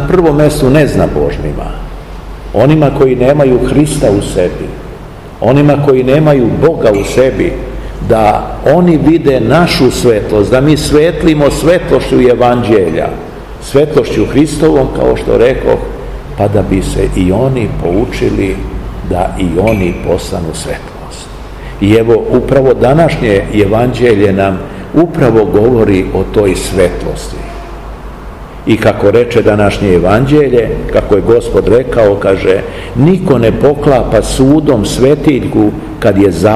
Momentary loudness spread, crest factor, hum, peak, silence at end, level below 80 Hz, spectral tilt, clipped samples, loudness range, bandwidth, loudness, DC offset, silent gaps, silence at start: 14 LU; 10 dB; none; 0 dBFS; 0 s; -24 dBFS; -6.5 dB/octave; 3%; 4 LU; 14.5 kHz; -9 LUFS; 0.7%; none; 0 s